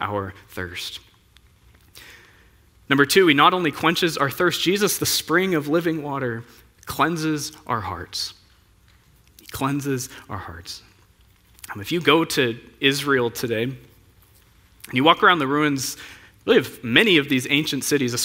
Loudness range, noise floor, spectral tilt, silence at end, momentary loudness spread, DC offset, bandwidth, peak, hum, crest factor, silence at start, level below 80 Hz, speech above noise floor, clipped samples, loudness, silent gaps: 11 LU; -56 dBFS; -3.5 dB/octave; 0 s; 19 LU; under 0.1%; 16.5 kHz; 0 dBFS; none; 22 dB; 0 s; -56 dBFS; 34 dB; under 0.1%; -20 LUFS; none